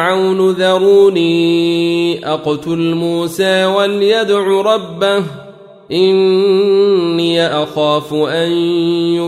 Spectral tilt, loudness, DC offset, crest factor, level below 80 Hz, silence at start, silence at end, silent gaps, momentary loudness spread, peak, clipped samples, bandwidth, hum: -5.5 dB/octave; -13 LUFS; under 0.1%; 12 dB; -58 dBFS; 0 s; 0 s; none; 6 LU; -2 dBFS; under 0.1%; 14 kHz; none